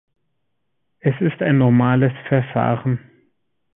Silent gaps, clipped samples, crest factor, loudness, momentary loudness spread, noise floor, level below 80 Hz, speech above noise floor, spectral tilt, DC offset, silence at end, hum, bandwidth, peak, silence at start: none; under 0.1%; 18 dB; -19 LUFS; 9 LU; -76 dBFS; -54 dBFS; 59 dB; -13 dB/octave; under 0.1%; 0.8 s; none; 3.8 kHz; -2 dBFS; 1.05 s